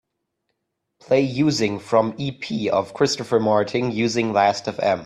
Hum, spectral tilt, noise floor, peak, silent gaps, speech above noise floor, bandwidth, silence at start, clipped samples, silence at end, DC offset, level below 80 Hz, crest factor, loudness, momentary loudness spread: none; -5 dB/octave; -77 dBFS; -4 dBFS; none; 56 dB; 12.5 kHz; 1.1 s; under 0.1%; 0 s; under 0.1%; -60 dBFS; 18 dB; -21 LUFS; 5 LU